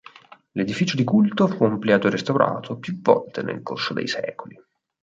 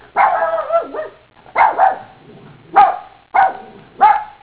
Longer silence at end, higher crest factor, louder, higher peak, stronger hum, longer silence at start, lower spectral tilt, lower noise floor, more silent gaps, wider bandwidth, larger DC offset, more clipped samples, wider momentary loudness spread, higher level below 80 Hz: first, 0.7 s vs 0.15 s; about the same, 20 dB vs 16 dB; second, -22 LUFS vs -15 LUFS; about the same, -2 dBFS vs 0 dBFS; neither; first, 0.55 s vs 0.15 s; about the same, -6.5 dB/octave vs -7 dB/octave; first, -47 dBFS vs -41 dBFS; neither; first, 7.6 kHz vs 4 kHz; second, under 0.1% vs 0.1%; neither; second, 11 LU vs 16 LU; second, -64 dBFS vs -56 dBFS